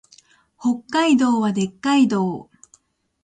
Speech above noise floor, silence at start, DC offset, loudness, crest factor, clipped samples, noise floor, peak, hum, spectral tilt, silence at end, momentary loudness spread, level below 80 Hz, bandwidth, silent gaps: 40 dB; 0.6 s; under 0.1%; -19 LUFS; 14 dB; under 0.1%; -59 dBFS; -6 dBFS; none; -5.5 dB/octave; 0.8 s; 9 LU; -62 dBFS; 9.4 kHz; none